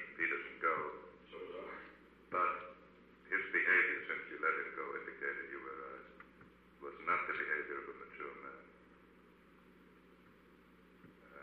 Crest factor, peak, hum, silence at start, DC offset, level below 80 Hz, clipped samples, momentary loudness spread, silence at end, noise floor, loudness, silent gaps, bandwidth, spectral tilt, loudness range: 22 dB; -20 dBFS; none; 0 s; under 0.1%; -76 dBFS; under 0.1%; 21 LU; 0 s; -64 dBFS; -38 LUFS; none; 7.2 kHz; -6 dB/octave; 14 LU